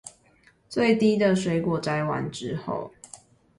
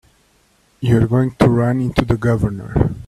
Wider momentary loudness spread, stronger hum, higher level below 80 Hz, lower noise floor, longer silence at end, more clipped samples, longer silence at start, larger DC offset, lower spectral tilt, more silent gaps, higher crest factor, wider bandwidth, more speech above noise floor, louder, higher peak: first, 21 LU vs 5 LU; neither; second, -60 dBFS vs -34 dBFS; about the same, -60 dBFS vs -57 dBFS; first, 0.45 s vs 0 s; neither; second, 0.05 s vs 0.8 s; neither; second, -6 dB/octave vs -8.5 dB/octave; neither; about the same, 18 dB vs 16 dB; about the same, 11.5 kHz vs 12 kHz; second, 36 dB vs 41 dB; second, -25 LUFS vs -17 LUFS; second, -8 dBFS vs 0 dBFS